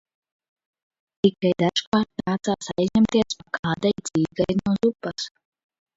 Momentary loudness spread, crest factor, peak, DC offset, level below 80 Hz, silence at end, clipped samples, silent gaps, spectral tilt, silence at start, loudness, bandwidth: 7 LU; 20 dB; -4 dBFS; under 0.1%; -54 dBFS; 0.7 s; under 0.1%; 1.87-1.92 s, 3.59-3.63 s; -5.5 dB/octave; 1.25 s; -23 LUFS; 8 kHz